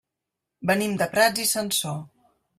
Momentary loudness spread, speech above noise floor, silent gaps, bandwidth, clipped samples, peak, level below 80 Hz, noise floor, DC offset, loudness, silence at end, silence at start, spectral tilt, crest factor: 11 LU; 61 dB; none; 16 kHz; under 0.1%; -6 dBFS; -64 dBFS; -85 dBFS; under 0.1%; -23 LUFS; 0.5 s; 0.6 s; -3 dB/octave; 20 dB